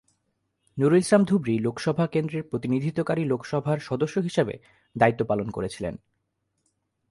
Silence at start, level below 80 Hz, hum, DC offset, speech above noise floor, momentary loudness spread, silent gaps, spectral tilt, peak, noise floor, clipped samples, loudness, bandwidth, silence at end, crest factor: 0.75 s; -58 dBFS; none; under 0.1%; 52 dB; 12 LU; none; -7 dB/octave; -4 dBFS; -76 dBFS; under 0.1%; -25 LUFS; 11.5 kHz; 1.15 s; 22 dB